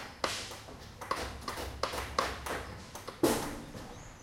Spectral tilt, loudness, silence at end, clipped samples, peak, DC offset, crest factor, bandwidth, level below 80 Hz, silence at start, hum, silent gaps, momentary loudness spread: -3.5 dB/octave; -37 LUFS; 0 s; under 0.1%; -12 dBFS; under 0.1%; 26 dB; 16.5 kHz; -50 dBFS; 0 s; none; none; 15 LU